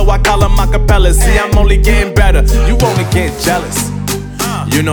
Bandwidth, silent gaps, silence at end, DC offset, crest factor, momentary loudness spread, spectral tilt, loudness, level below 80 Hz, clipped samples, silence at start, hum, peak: over 20 kHz; none; 0 s; under 0.1%; 10 dB; 7 LU; -5 dB/octave; -12 LUFS; -12 dBFS; under 0.1%; 0 s; 50 Hz at -20 dBFS; 0 dBFS